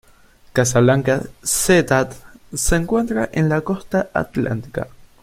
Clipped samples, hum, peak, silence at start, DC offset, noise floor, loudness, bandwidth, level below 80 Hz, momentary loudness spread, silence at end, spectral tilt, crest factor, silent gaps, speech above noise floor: under 0.1%; none; -2 dBFS; 0.55 s; under 0.1%; -49 dBFS; -19 LUFS; 16.5 kHz; -36 dBFS; 12 LU; 0.2 s; -5 dB/octave; 18 dB; none; 31 dB